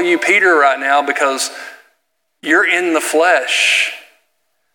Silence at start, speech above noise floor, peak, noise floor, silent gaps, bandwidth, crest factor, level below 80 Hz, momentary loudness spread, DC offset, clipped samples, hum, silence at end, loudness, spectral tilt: 0 s; 54 dB; 0 dBFS; -68 dBFS; none; 17.5 kHz; 16 dB; -84 dBFS; 14 LU; under 0.1%; under 0.1%; none; 0.75 s; -13 LUFS; -0.5 dB/octave